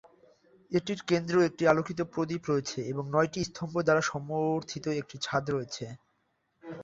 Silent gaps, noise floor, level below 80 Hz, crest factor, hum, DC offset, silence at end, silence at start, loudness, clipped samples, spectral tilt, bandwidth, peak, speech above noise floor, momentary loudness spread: none; -75 dBFS; -64 dBFS; 22 dB; none; under 0.1%; 0 s; 0.7 s; -30 LUFS; under 0.1%; -5.5 dB/octave; 7.8 kHz; -8 dBFS; 46 dB; 9 LU